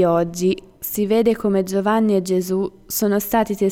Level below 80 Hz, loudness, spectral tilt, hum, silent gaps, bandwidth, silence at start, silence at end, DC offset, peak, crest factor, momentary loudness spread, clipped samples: -50 dBFS; -20 LUFS; -5.5 dB/octave; none; none; 19.5 kHz; 0 s; 0 s; under 0.1%; -6 dBFS; 14 dB; 6 LU; under 0.1%